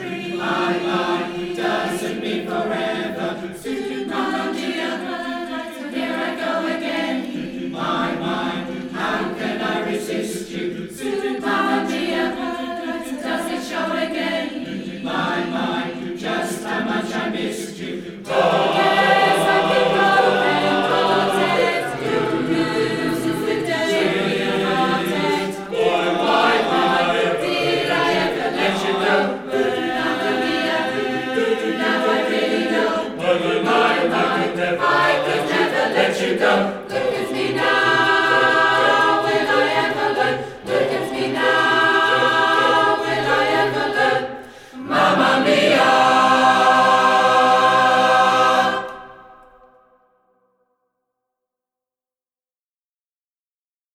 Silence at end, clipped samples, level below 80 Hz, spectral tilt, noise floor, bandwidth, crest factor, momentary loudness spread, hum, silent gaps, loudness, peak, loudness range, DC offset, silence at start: 4.6 s; under 0.1%; -56 dBFS; -4 dB/octave; under -90 dBFS; 16.5 kHz; 18 dB; 12 LU; none; none; -19 LUFS; -2 dBFS; 9 LU; under 0.1%; 0 s